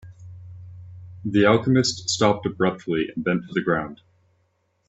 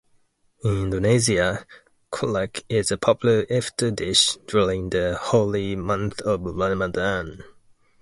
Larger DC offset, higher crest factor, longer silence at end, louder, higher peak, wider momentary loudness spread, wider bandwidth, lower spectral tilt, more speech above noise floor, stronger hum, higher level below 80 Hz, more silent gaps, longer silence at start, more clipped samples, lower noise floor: neither; about the same, 20 dB vs 18 dB; first, 0.95 s vs 0.5 s; about the same, -22 LUFS vs -22 LUFS; about the same, -4 dBFS vs -4 dBFS; first, 24 LU vs 8 LU; second, 8.4 kHz vs 11.5 kHz; about the same, -5 dB/octave vs -4.5 dB/octave; first, 47 dB vs 40 dB; neither; second, -58 dBFS vs -44 dBFS; neither; second, 0.05 s vs 0.65 s; neither; first, -68 dBFS vs -63 dBFS